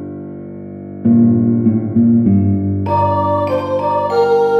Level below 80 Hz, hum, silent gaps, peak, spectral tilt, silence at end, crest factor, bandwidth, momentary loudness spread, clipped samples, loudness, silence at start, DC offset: -54 dBFS; 50 Hz at -35 dBFS; none; -2 dBFS; -10 dB/octave; 0 s; 12 dB; 5.4 kHz; 18 LU; under 0.1%; -14 LUFS; 0 s; under 0.1%